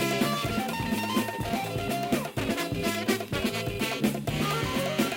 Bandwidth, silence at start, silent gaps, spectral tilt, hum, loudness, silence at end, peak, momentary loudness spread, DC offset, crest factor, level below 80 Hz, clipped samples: 17 kHz; 0 s; none; -4.5 dB/octave; none; -29 LUFS; 0 s; -12 dBFS; 3 LU; under 0.1%; 16 dB; -48 dBFS; under 0.1%